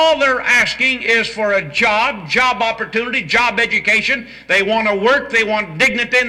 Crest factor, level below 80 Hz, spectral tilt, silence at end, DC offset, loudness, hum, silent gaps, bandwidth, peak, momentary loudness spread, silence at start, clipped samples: 12 dB; -48 dBFS; -3 dB/octave; 0 s; under 0.1%; -14 LUFS; none; none; 16 kHz; -4 dBFS; 5 LU; 0 s; under 0.1%